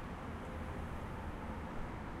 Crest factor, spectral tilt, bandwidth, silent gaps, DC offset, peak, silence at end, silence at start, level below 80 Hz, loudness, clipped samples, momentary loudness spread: 12 dB; -7 dB/octave; 15 kHz; none; under 0.1%; -30 dBFS; 0 s; 0 s; -50 dBFS; -45 LUFS; under 0.1%; 1 LU